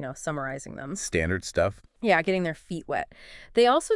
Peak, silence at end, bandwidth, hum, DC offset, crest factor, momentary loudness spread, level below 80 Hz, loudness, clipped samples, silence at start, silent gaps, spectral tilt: -8 dBFS; 0 s; 12 kHz; none; under 0.1%; 18 dB; 14 LU; -52 dBFS; -27 LUFS; under 0.1%; 0 s; none; -4.5 dB/octave